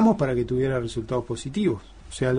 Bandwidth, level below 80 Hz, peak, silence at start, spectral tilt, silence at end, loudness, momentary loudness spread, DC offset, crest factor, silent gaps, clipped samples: 10 kHz; -44 dBFS; -8 dBFS; 0 s; -7 dB/octave; 0 s; -26 LUFS; 7 LU; under 0.1%; 16 dB; none; under 0.1%